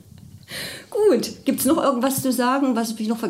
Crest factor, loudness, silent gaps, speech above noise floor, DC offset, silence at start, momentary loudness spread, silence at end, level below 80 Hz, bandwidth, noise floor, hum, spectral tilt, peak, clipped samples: 14 dB; -21 LUFS; none; 23 dB; under 0.1%; 0.35 s; 12 LU; 0 s; -60 dBFS; 16 kHz; -44 dBFS; none; -4 dB/octave; -8 dBFS; under 0.1%